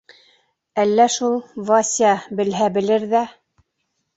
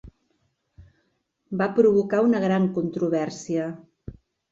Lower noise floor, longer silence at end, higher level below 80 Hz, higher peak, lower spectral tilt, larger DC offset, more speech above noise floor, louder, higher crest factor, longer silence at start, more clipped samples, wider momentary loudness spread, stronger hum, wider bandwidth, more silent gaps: about the same, -73 dBFS vs -72 dBFS; first, 0.85 s vs 0.4 s; second, -64 dBFS vs -56 dBFS; first, -2 dBFS vs -6 dBFS; second, -3.5 dB/octave vs -7.5 dB/octave; neither; first, 55 dB vs 50 dB; first, -19 LUFS vs -23 LUFS; about the same, 18 dB vs 18 dB; first, 0.75 s vs 0.05 s; neither; second, 8 LU vs 23 LU; neither; about the same, 8.2 kHz vs 7.8 kHz; neither